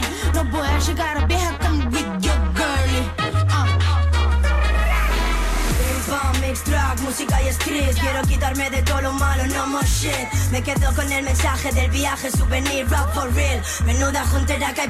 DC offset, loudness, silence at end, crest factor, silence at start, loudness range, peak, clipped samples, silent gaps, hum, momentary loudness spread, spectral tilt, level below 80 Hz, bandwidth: under 0.1%; -20 LUFS; 0 s; 10 dB; 0 s; 1 LU; -10 dBFS; under 0.1%; none; none; 3 LU; -4.5 dB/octave; -22 dBFS; 15 kHz